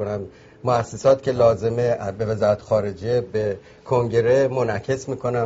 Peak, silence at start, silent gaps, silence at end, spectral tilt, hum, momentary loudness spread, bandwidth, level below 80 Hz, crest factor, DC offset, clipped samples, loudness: -4 dBFS; 0 s; none; 0 s; -6.5 dB/octave; none; 9 LU; 8 kHz; -52 dBFS; 18 dB; under 0.1%; under 0.1%; -21 LUFS